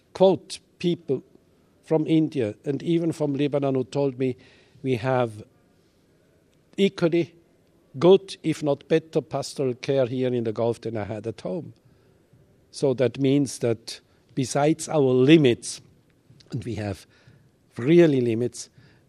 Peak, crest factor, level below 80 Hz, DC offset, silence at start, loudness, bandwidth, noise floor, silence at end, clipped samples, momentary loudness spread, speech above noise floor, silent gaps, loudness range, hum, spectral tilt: -2 dBFS; 22 dB; -66 dBFS; under 0.1%; 0.15 s; -24 LUFS; 12.5 kHz; -61 dBFS; 0.45 s; under 0.1%; 16 LU; 38 dB; none; 6 LU; none; -6.5 dB/octave